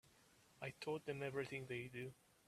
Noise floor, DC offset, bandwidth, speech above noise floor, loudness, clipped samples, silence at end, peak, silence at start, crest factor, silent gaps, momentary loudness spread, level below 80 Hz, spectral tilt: -72 dBFS; under 0.1%; 14.5 kHz; 24 dB; -48 LUFS; under 0.1%; 0.35 s; -30 dBFS; 0.05 s; 18 dB; none; 7 LU; -80 dBFS; -5.5 dB/octave